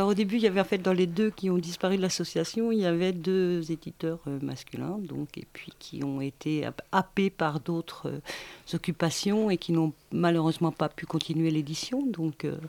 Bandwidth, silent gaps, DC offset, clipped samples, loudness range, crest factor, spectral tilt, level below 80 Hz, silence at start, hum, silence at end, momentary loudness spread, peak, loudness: 18.5 kHz; none; under 0.1%; under 0.1%; 5 LU; 20 dB; -6 dB/octave; -62 dBFS; 0 s; none; 0 s; 11 LU; -8 dBFS; -29 LUFS